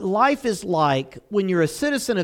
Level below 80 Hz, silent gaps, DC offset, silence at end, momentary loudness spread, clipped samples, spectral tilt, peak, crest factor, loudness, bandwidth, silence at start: -56 dBFS; none; under 0.1%; 0 s; 6 LU; under 0.1%; -5 dB/octave; -6 dBFS; 16 dB; -22 LUFS; 17.5 kHz; 0 s